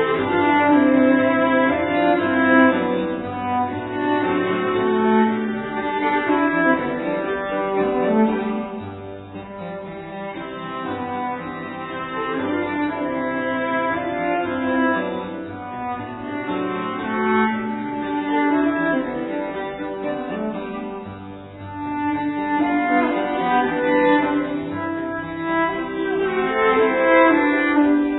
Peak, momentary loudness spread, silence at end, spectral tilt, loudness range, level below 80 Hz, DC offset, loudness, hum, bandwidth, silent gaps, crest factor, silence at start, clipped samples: -2 dBFS; 14 LU; 0 s; -10 dB/octave; 8 LU; -54 dBFS; under 0.1%; -20 LUFS; none; 4.1 kHz; none; 18 dB; 0 s; under 0.1%